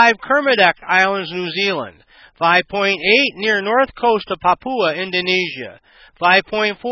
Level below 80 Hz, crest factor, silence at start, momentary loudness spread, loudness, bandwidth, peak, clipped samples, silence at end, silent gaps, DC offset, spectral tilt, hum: -56 dBFS; 18 dB; 0 s; 9 LU; -16 LUFS; 6.8 kHz; 0 dBFS; under 0.1%; 0 s; none; under 0.1%; -4 dB/octave; none